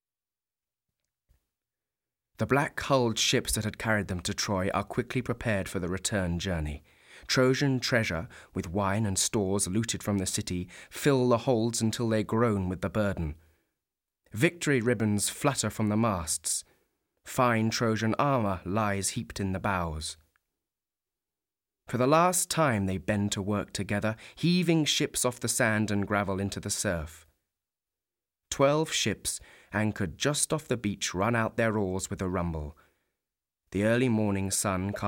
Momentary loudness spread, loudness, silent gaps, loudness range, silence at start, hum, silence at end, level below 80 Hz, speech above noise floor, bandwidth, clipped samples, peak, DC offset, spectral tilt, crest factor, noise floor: 9 LU; -28 LUFS; none; 3 LU; 2.4 s; none; 0 s; -52 dBFS; over 62 dB; 17 kHz; under 0.1%; -10 dBFS; under 0.1%; -4.5 dB/octave; 20 dB; under -90 dBFS